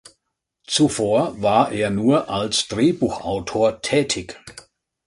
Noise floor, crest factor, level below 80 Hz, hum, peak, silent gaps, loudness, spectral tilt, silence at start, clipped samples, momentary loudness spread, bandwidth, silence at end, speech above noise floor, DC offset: -76 dBFS; 18 dB; -50 dBFS; none; -2 dBFS; none; -20 LUFS; -4.5 dB/octave; 0.7 s; under 0.1%; 7 LU; 11.5 kHz; 0.45 s; 57 dB; under 0.1%